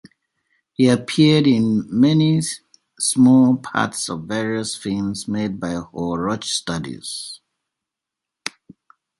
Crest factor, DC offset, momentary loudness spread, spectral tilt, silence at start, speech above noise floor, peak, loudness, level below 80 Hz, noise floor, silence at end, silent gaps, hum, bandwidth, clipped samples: 18 dB; under 0.1%; 17 LU; -5 dB/octave; 0.8 s; 66 dB; -2 dBFS; -19 LUFS; -54 dBFS; -85 dBFS; 0.7 s; none; none; 11.5 kHz; under 0.1%